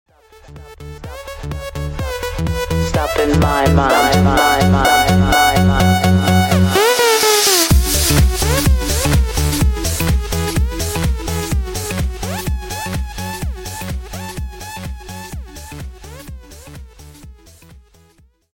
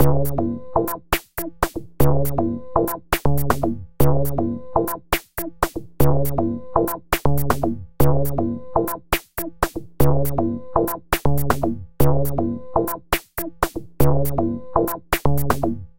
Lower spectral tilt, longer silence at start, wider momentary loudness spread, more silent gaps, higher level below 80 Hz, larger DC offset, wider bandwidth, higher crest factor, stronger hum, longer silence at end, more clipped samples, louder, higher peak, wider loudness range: second, -4.5 dB/octave vs -6 dB/octave; first, 0.45 s vs 0 s; first, 20 LU vs 6 LU; neither; first, -24 dBFS vs -32 dBFS; neither; about the same, 17 kHz vs 17.5 kHz; about the same, 14 dB vs 18 dB; neither; first, 0.75 s vs 0 s; neither; first, -15 LUFS vs -22 LUFS; about the same, -2 dBFS vs -2 dBFS; first, 17 LU vs 1 LU